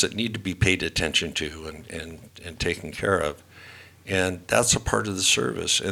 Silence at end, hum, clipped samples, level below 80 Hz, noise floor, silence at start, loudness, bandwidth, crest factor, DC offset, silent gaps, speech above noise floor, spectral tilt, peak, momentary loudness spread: 0 s; none; under 0.1%; -44 dBFS; -47 dBFS; 0 s; -24 LUFS; 19.5 kHz; 24 dB; under 0.1%; none; 21 dB; -3 dB/octave; -2 dBFS; 20 LU